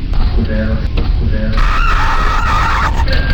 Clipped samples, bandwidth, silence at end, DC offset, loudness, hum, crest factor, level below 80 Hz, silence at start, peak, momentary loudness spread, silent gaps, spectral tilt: under 0.1%; 8.2 kHz; 0 s; under 0.1%; -15 LUFS; none; 10 dB; -14 dBFS; 0 s; 0 dBFS; 4 LU; none; -6 dB/octave